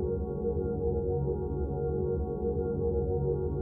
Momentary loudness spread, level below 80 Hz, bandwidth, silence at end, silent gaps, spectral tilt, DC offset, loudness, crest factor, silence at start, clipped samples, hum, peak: 2 LU; -40 dBFS; 1.6 kHz; 0 s; none; -14.5 dB/octave; under 0.1%; -32 LUFS; 12 dB; 0 s; under 0.1%; none; -18 dBFS